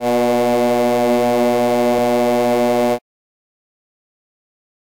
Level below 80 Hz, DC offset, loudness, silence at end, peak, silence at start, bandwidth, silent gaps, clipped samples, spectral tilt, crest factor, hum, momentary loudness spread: -56 dBFS; 0.7%; -16 LUFS; 2 s; -6 dBFS; 0 s; 17 kHz; none; under 0.1%; -5 dB/octave; 12 dB; none; 1 LU